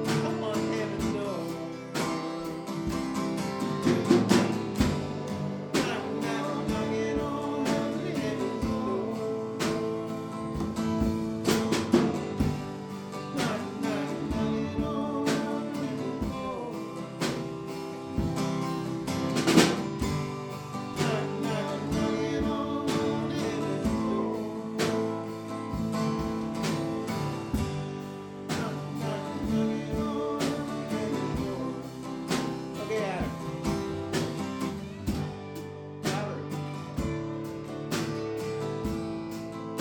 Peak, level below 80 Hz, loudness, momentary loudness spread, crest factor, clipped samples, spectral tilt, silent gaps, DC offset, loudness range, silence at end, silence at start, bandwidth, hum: -6 dBFS; -48 dBFS; -31 LUFS; 8 LU; 24 dB; under 0.1%; -5.5 dB/octave; none; under 0.1%; 5 LU; 0 s; 0 s; 19 kHz; none